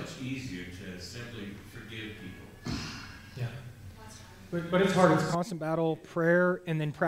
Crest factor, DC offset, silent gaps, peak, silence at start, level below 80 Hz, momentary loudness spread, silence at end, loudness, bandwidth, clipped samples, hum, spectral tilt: 22 dB; under 0.1%; none; -10 dBFS; 0 s; -56 dBFS; 21 LU; 0 s; -30 LUFS; 16 kHz; under 0.1%; none; -6 dB/octave